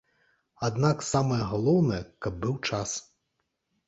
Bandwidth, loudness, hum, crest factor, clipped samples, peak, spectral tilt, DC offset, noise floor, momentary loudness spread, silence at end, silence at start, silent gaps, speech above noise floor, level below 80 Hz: 8.2 kHz; -28 LUFS; none; 18 dB; under 0.1%; -10 dBFS; -5.5 dB/octave; under 0.1%; -79 dBFS; 9 LU; 0.85 s; 0.6 s; none; 52 dB; -52 dBFS